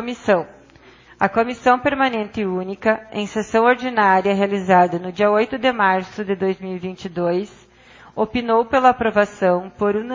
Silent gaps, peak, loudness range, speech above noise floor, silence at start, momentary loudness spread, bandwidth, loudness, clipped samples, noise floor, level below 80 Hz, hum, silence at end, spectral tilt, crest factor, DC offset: none; 0 dBFS; 4 LU; 29 dB; 0 s; 10 LU; 7.6 kHz; -19 LUFS; under 0.1%; -48 dBFS; -52 dBFS; none; 0 s; -6 dB/octave; 18 dB; under 0.1%